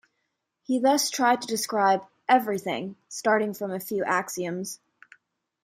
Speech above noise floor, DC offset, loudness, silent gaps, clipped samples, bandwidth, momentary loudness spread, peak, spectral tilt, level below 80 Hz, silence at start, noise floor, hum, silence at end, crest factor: 54 dB; under 0.1%; -25 LUFS; none; under 0.1%; 16.5 kHz; 11 LU; -8 dBFS; -3.5 dB/octave; -76 dBFS; 0.7 s; -79 dBFS; none; 0.9 s; 20 dB